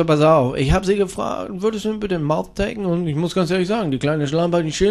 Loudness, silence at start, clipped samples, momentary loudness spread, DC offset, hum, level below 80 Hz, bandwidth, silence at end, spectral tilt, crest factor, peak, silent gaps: -20 LUFS; 0 s; under 0.1%; 8 LU; under 0.1%; none; -36 dBFS; 13 kHz; 0 s; -6.5 dB/octave; 16 dB; -2 dBFS; none